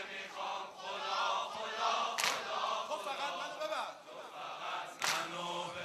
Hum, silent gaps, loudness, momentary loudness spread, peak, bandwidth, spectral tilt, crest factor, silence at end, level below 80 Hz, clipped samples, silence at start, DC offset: none; none; -37 LUFS; 9 LU; -14 dBFS; 13.5 kHz; -0.5 dB/octave; 24 dB; 0 s; -86 dBFS; under 0.1%; 0 s; under 0.1%